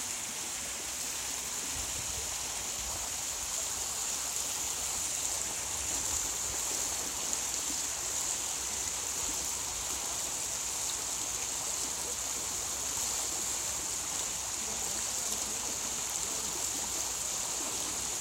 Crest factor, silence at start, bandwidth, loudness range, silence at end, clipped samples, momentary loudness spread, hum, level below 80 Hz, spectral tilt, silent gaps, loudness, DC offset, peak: 22 dB; 0 s; 16 kHz; 1 LU; 0 s; under 0.1%; 3 LU; none; -56 dBFS; 0 dB/octave; none; -32 LUFS; under 0.1%; -14 dBFS